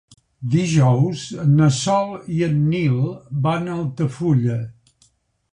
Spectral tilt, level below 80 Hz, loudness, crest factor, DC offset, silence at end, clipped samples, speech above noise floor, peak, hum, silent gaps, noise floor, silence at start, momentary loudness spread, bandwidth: -7 dB/octave; -50 dBFS; -20 LUFS; 16 dB; under 0.1%; 0.8 s; under 0.1%; 42 dB; -4 dBFS; none; none; -60 dBFS; 0.4 s; 9 LU; 10.5 kHz